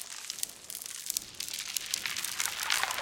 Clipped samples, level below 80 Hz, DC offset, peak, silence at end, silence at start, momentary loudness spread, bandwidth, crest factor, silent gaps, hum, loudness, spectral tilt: under 0.1%; -70 dBFS; under 0.1%; -6 dBFS; 0 s; 0 s; 9 LU; 17 kHz; 30 dB; none; none; -33 LUFS; 2 dB/octave